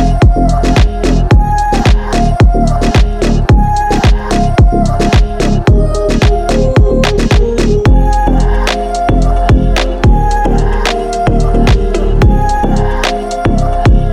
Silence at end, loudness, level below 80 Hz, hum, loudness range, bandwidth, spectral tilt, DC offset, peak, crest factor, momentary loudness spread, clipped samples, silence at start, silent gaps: 0 s; -11 LUFS; -10 dBFS; none; 1 LU; 11 kHz; -6.5 dB/octave; under 0.1%; 0 dBFS; 8 dB; 4 LU; under 0.1%; 0 s; none